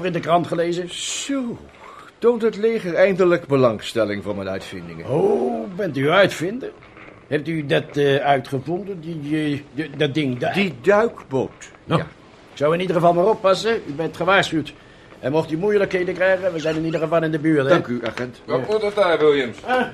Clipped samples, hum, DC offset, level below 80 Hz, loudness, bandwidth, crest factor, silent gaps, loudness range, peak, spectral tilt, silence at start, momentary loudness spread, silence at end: under 0.1%; none; under 0.1%; -56 dBFS; -20 LUFS; 13.5 kHz; 18 dB; none; 2 LU; -2 dBFS; -5.5 dB/octave; 0 s; 11 LU; 0 s